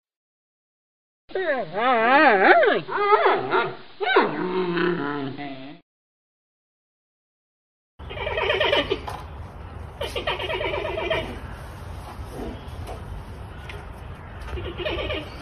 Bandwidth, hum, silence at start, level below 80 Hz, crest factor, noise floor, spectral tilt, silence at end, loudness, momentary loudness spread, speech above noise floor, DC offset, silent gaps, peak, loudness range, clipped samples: 13 kHz; none; 1.3 s; -42 dBFS; 22 dB; under -90 dBFS; -6 dB/octave; 0 s; -22 LUFS; 21 LU; over 71 dB; under 0.1%; 5.82-7.98 s; -2 dBFS; 16 LU; under 0.1%